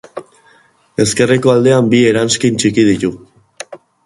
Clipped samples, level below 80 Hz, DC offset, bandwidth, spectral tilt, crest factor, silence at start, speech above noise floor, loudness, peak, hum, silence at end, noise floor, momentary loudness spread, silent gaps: under 0.1%; -48 dBFS; under 0.1%; 11.5 kHz; -5 dB/octave; 14 dB; 0.15 s; 39 dB; -12 LUFS; 0 dBFS; none; 0.3 s; -50 dBFS; 21 LU; none